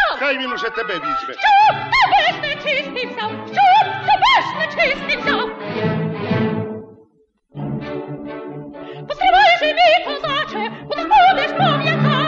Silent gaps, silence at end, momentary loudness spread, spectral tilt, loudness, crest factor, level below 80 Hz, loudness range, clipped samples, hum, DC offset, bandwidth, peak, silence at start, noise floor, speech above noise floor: none; 0 s; 17 LU; -5.5 dB/octave; -16 LUFS; 14 dB; -48 dBFS; 9 LU; under 0.1%; none; under 0.1%; 7.8 kHz; -4 dBFS; 0 s; -58 dBFS; 41 dB